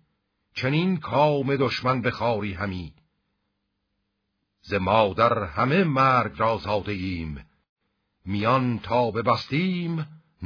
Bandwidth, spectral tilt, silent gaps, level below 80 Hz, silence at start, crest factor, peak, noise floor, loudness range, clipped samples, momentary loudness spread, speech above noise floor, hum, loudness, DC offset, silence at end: 5.4 kHz; -7.5 dB/octave; 7.69-7.76 s; -52 dBFS; 0.55 s; 20 dB; -6 dBFS; -77 dBFS; 5 LU; under 0.1%; 12 LU; 53 dB; none; -24 LUFS; under 0.1%; 0 s